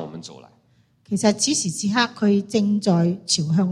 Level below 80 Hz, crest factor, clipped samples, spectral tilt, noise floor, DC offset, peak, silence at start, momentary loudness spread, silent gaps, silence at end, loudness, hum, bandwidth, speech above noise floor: -64 dBFS; 18 dB; under 0.1%; -4.5 dB/octave; -60 dBFS; under 0.1%; -4 dBFS; 0 s; 11 LU; none; 0 s; -20 LUFS; none; 12.5 kHz; 39 dB